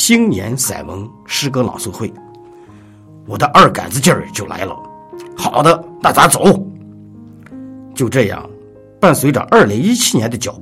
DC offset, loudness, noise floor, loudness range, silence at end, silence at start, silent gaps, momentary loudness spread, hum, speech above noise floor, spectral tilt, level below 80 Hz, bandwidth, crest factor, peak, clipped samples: under 0.1%; -13 LUFS; -40 dBFS; 3 LU; 0 s; 0 s; none; 20 LU; none; 26 dB; -4 dB/octave; -48 dBFS; 18.5 kHz; 14 dB; 0 dBFS; 0.1%